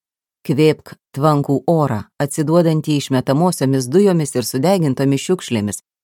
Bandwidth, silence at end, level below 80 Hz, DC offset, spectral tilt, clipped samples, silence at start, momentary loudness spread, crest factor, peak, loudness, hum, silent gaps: 17.5 kHz; 0.25 s; -60 dBFS; under 0.1%; -6 dB/octave; under 0.1%; 0.45 s; 8 LU; 16 dB; 0 dBFS; -17 LUFS; none; none